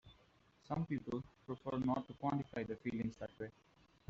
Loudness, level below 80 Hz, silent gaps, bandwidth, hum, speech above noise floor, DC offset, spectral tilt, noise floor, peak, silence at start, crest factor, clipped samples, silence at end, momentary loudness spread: -43 LUFS; -68 dBFS; none; 7.6 kHz; none; 29 dB; under 0.1%; -7.5 dB/octave; -71 dBFS; -26 dBFS; 0.05 s; 18 dB; under 0.1%; 0.6 s; 10 LU